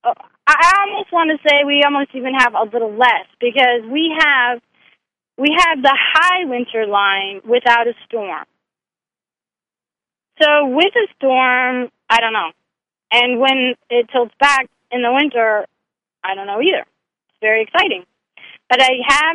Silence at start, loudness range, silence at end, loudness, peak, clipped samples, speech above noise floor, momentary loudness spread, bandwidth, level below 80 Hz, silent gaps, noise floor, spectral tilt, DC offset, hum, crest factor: 0.05 s; 5 LU; 0 s; -14 LUFS; 0 dBFS; under 0.1%; over 75 dB; 10 LU; 11.5 kHz; -54 dBFS; none; under -90 dBFS; -2 dB/octave; under 0.1%; none; 16 dB